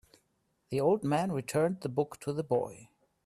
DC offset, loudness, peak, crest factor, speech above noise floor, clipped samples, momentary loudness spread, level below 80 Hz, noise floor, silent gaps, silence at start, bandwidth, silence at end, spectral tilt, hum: under 0.1%; -32 LUFS; -14 dBFS; 18 dB; 45 dB; under 0.1%; 8 LU; -70 dBFS; -76 dBFS; none; 0.7 s; 14 kHz; 0.4 s; -6.5 dB/octave; none